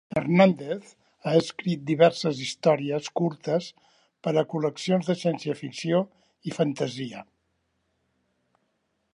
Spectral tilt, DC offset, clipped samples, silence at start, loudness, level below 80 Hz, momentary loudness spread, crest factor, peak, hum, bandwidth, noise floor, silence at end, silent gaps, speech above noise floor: -6 dB/octave; under 0.1%; under 0.1%; 0.1 s; -26 LUFS; -70 dBFS; 15 LU; 22 dB; -6 dBFS; none; 11 kHz; -75 dBFS; 1.9 s; none; 50 dB